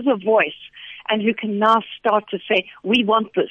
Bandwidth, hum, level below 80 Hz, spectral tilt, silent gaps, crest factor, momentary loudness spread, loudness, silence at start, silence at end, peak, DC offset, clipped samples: 8.8 kHz; none; -64 dBFS; -6 dB/octave; none; 16 dB; 7 LU; -19 LUFS; 0 s; 0 s; -4 dBFS; under 0.1%; under 0.1%